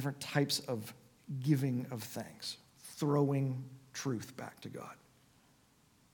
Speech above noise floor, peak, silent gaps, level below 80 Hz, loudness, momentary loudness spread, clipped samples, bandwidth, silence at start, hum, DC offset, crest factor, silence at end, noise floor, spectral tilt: 32 dB; -16 dBFS; none; -78 dBFS; -37 LUFS; 17 LU; under 0.1%; 19 kHz; 0 s; none; under 0.1%; 22 dB; 1.2 s; -68 dBFS; -5.5 dB/octave